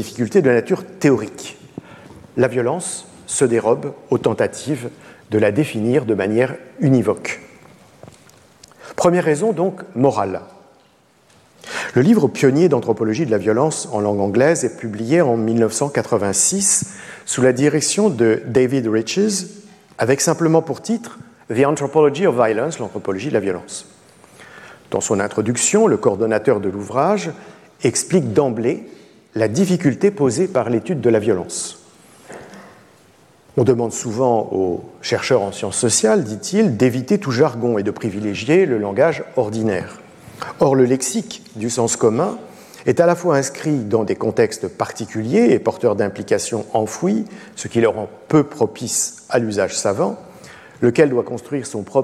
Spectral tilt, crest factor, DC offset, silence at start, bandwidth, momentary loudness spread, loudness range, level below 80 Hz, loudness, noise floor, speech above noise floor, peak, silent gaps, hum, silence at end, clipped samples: -5 dB/octave; 16 dB; under 0.1%; 0 s; 15 kHz; 11 LU; 4 LU; -60 dBFS; -18 LUFS; -54 dBFS; 37 dB; -2 dBFS; none; none; 0 s; under 0.1%